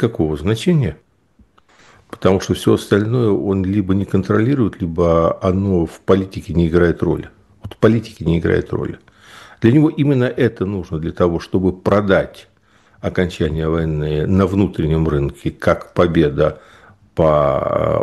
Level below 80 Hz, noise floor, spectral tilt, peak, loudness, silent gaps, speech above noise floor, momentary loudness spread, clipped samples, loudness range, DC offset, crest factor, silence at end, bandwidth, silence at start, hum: -36 dBFS; -54 dBFS; -8 dB/octave; 0 dBFS; -17 LUFS; none; 38 dB; 8 LU; under 0.1%; 2 LU; under 0.1%; 16 dB; 0 s; 12.5 kHz; 0 s; none